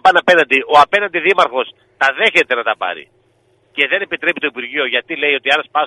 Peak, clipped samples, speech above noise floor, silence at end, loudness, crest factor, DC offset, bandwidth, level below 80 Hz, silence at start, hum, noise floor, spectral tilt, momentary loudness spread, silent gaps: 0 dBFS; 0.1%; 42 dB; 0 s; -14 LUFS; 16 dB; under 0.1%; 12 kHz; -60 dBFS; 0.05 s; none; -57 dBFS; -3 dB/octave; 10 LU; none